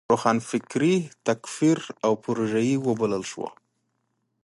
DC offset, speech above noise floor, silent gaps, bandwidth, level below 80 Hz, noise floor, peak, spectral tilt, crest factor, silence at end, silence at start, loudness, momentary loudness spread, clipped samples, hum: under 0.1%; 50 dB; none; 11.5 kHz; -68 dBFS; -75 dBFS; -6 dBFS; -5.5 dB/octave; 20 dB; 0.95 s; 0.1 s; -25 LUFS; 7 LU; under 0.1%; none